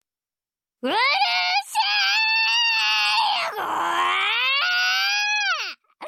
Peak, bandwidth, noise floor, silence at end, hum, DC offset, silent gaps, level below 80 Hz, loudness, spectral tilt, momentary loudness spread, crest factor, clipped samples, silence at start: -10 dBFS; 17 kHz; under -90 dBFS; 0 s; none; under 0.1%; none; -80 dBFS; -19 LUFS; 1 dB/octave; 7 LU; 14 dB; under 0.1%; 0.85 s